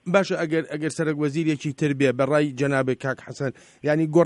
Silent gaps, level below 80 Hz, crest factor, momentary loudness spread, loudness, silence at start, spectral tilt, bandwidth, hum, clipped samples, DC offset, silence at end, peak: none; -64 dBFS; 18 dB; 9 LU; -24 LUFS; 0.05 s; -6.5 dB/octave; 11.5 kHz; none; under 0.1%; under 0.1%; 0 s; -6 dBFS